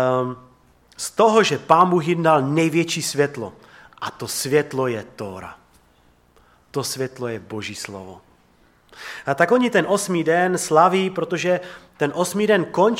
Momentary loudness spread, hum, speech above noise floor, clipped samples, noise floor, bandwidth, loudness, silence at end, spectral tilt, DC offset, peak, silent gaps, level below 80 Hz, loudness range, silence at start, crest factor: 17 LU; none; 37 dB; under 0.1%; -57 dBFS; 16.5 kHz; -20 LUFS; 0 s; -4.5 dB/octave; under 0.1%; -2 dBFS; none; -62 dBFS; 12 LU; 0 s; 20 dB